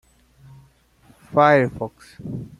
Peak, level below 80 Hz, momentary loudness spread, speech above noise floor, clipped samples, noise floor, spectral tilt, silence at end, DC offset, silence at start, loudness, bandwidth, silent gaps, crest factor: -2 dBFS; -56 dBFS; 18 LU; 35 dB; under 0.1%; -55 dBFS; -7.5 dB/octave; 0.1 s; under 0.1%; 1.3 s; -18 LUFS; 12 kHz; none; 22 dB